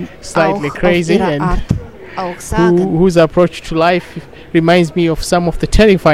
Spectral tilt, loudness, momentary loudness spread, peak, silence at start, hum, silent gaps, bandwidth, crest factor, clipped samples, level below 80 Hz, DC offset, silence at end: -6 dB/octave; -13 LUFS; 11 LU; 0 dBFS; 0 s; none; none; 14 kHz; 12 dB; 0.1%; -24 dBFS; 0.9%; 0 s